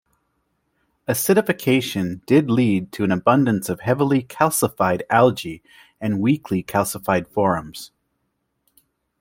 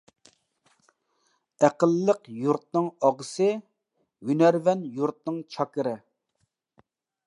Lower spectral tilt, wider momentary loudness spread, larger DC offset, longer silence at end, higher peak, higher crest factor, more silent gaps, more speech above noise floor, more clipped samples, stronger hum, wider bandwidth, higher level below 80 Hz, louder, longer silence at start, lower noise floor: about the same, -5.5 dB/octave vs -6.5 dB/octave; about the same, 12 LU vs 12 LU; neither; about the same, 1.35 s vs 1.3 s; first, -2 dBFS vs -6 dBFS; about the same, 18 dB vs 22 dB; neither; about the same, 54 dB vs 51 dB; neither; neither; first, 16.5 kHz vs 11 kHz; first, -58 dBFS vs -82 dBFS; first, -20 LUFS vs -25 LUFS; second, 1.1 s vs 1.6 s; about the same, -73 dBFS vs -76 dBFS